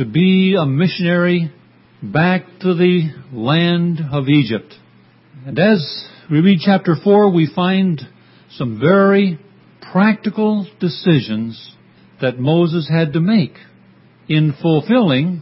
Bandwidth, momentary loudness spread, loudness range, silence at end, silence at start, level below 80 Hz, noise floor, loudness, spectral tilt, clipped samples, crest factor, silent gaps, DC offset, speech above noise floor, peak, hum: 5.8 kHz; 12 LU; 3 LU; 0 s; 0 s; -58 dBFS; -49 dBFS; -15 LUFS; -11.5 dB/octave; under 0.1%; 16 dB; none; under 0.1%; 34 dB; 0 dBFS; none